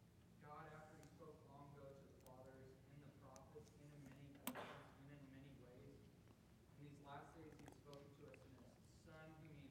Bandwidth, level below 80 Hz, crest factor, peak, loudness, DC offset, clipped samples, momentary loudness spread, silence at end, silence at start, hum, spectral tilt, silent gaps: 16 kHz; -78 dBFS; 30 dB; -32 dBFS; -62 LUFS; under 0.1%; under 0.1%; 8 LU; 0 s; 0 s; none; -5 dB/octave; none